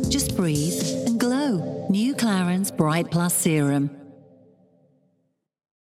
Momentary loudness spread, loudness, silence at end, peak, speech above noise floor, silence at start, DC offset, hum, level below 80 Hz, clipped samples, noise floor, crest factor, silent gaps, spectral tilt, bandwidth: 4 LU; -23 LUFS; 1.7 s; -6 dBFS; 50 dB; 0 s; under 0.1%; none; -48 dBFS; under 0.1%; -71 dBFS; 18 dB; none; -5 dB/octave; 16.5 kHz